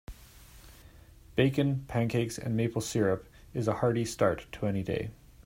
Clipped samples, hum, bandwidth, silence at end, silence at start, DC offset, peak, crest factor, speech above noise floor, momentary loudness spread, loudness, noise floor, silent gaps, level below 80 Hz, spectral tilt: under 0.1%; none; 16 kHz; 0.35 s; 0.1 s; under 0.1%; -10 dBFS; 22 dB; 24 dB; 8 LU; -31 LUFS; -54 dBFS; none; -54 dBFS; -6 dB/octave